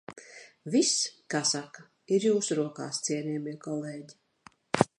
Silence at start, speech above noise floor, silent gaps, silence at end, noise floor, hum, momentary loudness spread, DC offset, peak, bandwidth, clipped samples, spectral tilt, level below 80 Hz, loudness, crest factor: 0.1 s; 29 dB; none; 0.15 s; -59 dBFS; none; 20 LU; under 0.1%; -2 dBFS; 11.5 kHz; under 0.1%; -3.5 dB/octave; -70 dBFS; -29 LUFS; 28 dB